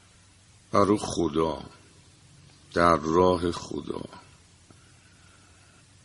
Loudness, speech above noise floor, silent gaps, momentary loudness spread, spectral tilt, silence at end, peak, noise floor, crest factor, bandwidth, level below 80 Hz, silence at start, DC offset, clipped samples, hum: -25 LUFS; 32 dB; none; 16 LU; -5.5 dB/octave; 1.85 s; -4 dBFS; -56 dBFS; 24 dB; 11.5 kHz; -52 dBFS; 0.75 s; under 0.1%; under 0.1%; none